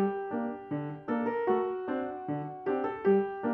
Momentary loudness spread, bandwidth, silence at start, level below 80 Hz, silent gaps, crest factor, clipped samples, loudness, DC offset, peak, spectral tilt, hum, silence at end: 9 LU; 4 kHz; 0 s; -72 dBFS; none; 16 dB; under 0.1%; -32 LUFS; under 0.1%; -16 dBFS; -10.5 dB/octave; none; 0 s